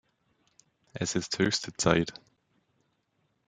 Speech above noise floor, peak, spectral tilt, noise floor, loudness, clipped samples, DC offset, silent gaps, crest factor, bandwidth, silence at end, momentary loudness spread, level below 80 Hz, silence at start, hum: 46 dB; -4 dBFS; -4 dB/octave; -75 dBFS; -29 LUFS; under 0.1%; under 0.1%; none; 28 dB; 9.6 kHz; 1.35 s; 10 LU; -60 dBFS; 0.95 s; none